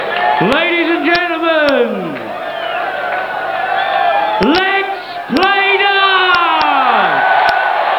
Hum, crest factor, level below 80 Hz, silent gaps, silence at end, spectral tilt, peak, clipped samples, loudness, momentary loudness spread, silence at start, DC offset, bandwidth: 50 Hz at -55 dBFS; 14 dB; -48 dBFS; none; 0 s; -5 dB/octave; 0 dBFS; under 0.1%; -12 LUFS; 9 LU; 0 s; under 0.1%; 20 kHz